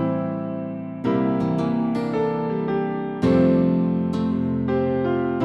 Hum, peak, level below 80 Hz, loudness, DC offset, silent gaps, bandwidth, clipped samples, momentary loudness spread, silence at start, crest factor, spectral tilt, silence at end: none; -6 dBFS; -50 dBFS; -22 LUFS; under 0.1%; none; 7.8 kHz; under 0.1%; 9 LU; 0 s; 16 dB; -9.5 dB/octave; 0 s